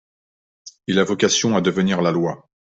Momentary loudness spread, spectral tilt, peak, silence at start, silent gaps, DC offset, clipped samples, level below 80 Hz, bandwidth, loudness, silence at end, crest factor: 10 LU; -4.5 dB/octave; -4 dBFS; 0.65 s; none; under 0.1%; under 0.1%; -58 dBFS; 8 kHz; -19 LUFS; 0.4 s; 18 dB